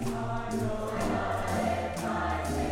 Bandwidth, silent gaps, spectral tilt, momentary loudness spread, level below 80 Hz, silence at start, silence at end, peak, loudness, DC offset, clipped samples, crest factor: 16.5 kHz; none; -6 dB/octave; 3 LU; -42 dBFS; 0 s; 0 s; -18 dBFS; -31 LUFS; under 0.1%; under 0.1%; 12 dB